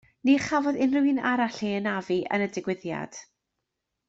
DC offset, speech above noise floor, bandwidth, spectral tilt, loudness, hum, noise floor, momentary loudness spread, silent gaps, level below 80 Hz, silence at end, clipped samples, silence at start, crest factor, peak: under 0.1%; 57 dB; 8 kHz; -5.5 dB/octave; -26 LUFS; none; -83 dBFS; 11 LU; none; -66 dBFS; 0.85 s; under 0.1%; 0.25 s; 18 dB; -10 dBFS